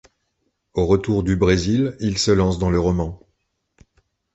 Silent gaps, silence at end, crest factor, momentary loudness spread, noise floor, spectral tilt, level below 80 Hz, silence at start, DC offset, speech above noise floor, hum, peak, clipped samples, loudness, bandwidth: none; 1.2 s; 18 dB; 7 LU; -72 dBFS; -6 dB/octave; -34 dBFS; 0.75 s; under 0.1%; 53 dB; none; -2 dBFS; under 0.1%; -20 LUFS; 8.2 kHz